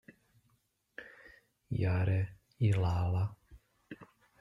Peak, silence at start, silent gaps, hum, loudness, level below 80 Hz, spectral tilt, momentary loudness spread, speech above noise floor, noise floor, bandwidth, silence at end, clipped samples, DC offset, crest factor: -18 dBFS; 1 s; none; none; -33 LUFS; -58 dBFS; -8.5 dB/octave; 22 LU; 45 dB; -76 dBFS; 7.4 kHz; 0.35 s; under 0.1%; under 0.1%; 16 dB